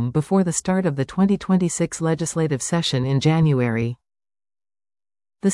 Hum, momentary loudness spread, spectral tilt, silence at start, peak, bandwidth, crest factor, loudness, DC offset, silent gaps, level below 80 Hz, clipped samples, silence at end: none; 5 LU; -5.5 dB/octave; 0 s; -8 dBFS; 12 kHz; 14 dB; -21 LUFS; under 0.1%; none; -52 dBFS; under 0.1%; 0 s